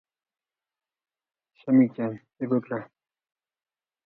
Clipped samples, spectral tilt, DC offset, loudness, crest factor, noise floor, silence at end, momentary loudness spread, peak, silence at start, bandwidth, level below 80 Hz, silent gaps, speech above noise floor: under 0.1%; -12 dB/octave; under 0.1%; -26 LUFS; 20 dB; under -90 dBFS; 1.2 s; 14 LU; -8 dBFS; 1.65 s; 4 kHz; -76 dBFS; none; over 65 dB